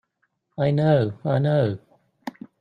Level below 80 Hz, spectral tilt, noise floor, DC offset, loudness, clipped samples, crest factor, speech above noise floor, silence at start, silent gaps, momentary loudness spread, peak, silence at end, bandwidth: -62 dBFS; -9.5 dB/octave; -72 dBFS; under 0.1%; -22 LUFS; under 0.1%; 16 dB; 52 dB; 0.6 s; none; 19 LU; -8 dBFS; 0.3 s; 5.4 kHz